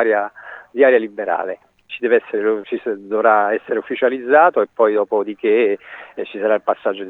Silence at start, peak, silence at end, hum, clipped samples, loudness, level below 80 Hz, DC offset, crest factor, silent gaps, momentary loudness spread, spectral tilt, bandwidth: 0 s; 0 dBFS; 0 s; none; under 0.1%; -17 LUFS; -72 dBFS; under 0.1%; 18 dB; none; 15 LU; -7 dB/octave; 4 kHz